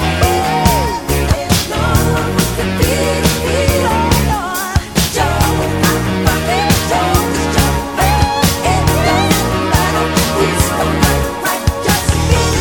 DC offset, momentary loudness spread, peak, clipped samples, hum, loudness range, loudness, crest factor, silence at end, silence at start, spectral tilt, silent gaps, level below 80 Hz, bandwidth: under 0.1%; 3 LU; 0 dBFS; under 0.1%; none; 1 LU; -13 LUFS; 14 dB; 0 s; 0 s; -4.5 dB/octave; none; -22 dBFS; over 20 kHz